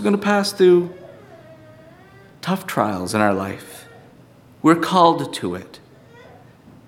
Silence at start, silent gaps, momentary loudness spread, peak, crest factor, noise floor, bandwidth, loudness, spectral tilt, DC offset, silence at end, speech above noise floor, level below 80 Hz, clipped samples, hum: 0 s; none; 18 LU; -2 dBFS; 20 dB; -48 dBFS; 16.5 kHz; -19 LUFS; -5.5 dB/octave; under 0.1%; 1.1 s; 30 dB; -62 dBFS; under 0.1%; none